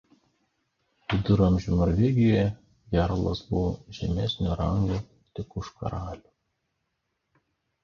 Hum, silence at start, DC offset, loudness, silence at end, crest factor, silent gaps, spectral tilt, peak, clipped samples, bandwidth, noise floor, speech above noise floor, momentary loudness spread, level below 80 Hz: none; 1.1 s; under 0.1%; -26 LUFS; 1.65 s; 20 dB; none; -8 dB/octave; -8 dBFS; under 0.1%; 7 kHz; -79 dBFS; 54 dB; 17 LU; -40 dBFS